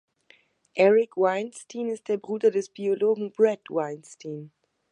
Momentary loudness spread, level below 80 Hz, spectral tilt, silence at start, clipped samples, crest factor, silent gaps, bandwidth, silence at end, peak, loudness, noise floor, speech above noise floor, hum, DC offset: 18 LU; -82 dBFS; -5.5 dB/octave; 0.75 s; under 0.1%; 18 dB; none; 10.5 kHz; 0.45 s; -8 dBFS; -25 LUFS; -61 dBFS; 36 dB; none; under 0.1%